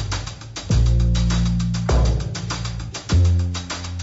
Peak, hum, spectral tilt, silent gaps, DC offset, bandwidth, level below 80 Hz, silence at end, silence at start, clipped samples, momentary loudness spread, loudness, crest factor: -8 dBFS; none; -5.5 dB/octave; none; under 0.1%; 8 kHz; -24 dBFS; 0 s; 0 s; under 0.1%; 11 LU; -21 LUFS; 12 dB